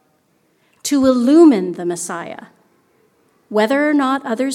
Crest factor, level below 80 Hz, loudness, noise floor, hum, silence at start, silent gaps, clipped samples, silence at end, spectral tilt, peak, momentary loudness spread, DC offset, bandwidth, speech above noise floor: 16 dB; -60 dBFS; -15 LUFS; -60 dBFS; none; 0.85 s; none; under 0.1%; 0 s; -4.5 dB/octave; -2 dBFS; 17 LU; under 0.1%; 14 kHz; 46 dB